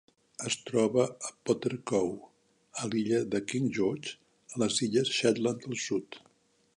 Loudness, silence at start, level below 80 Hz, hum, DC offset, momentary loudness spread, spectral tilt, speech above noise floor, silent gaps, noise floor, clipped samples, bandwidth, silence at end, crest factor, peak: -31 LUFS; 0.4 s; -70 dBFS; none; under 0.1%; 15 LU; -4.5 dB/octave; 38 dB; none; -68 dBFS; under 0.1%; 11 kHz; 0.6 s; 20 dB; -12 dBFS